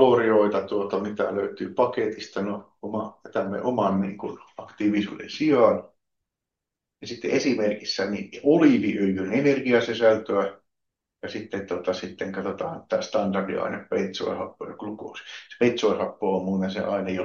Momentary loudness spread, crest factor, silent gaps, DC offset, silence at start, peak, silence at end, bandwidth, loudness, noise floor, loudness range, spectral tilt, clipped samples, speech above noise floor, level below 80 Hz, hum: 15 LU; 20 dB; none; under 0.1%; 0 s; -4 dBFS; 0 s; 7.2 kHz; -25 LUFS; -86 dBFS; 6 LU; -6 dB/octave; under 0.1%; 62 dB; -70 dBFS; none